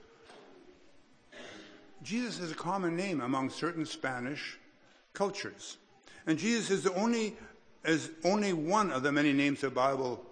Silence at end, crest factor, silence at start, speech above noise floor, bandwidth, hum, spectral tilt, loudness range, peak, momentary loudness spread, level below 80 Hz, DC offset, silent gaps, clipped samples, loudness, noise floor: 0 s; 20 dB; 0 s; 30 dB; 9.8 kHz; none; -4.5 dB/octave; 7 LU; -14 dBFS; 19 LU; -72 dBFS; under 0.1%; none; under 0.1%; -32 LUFS; -62 dBFS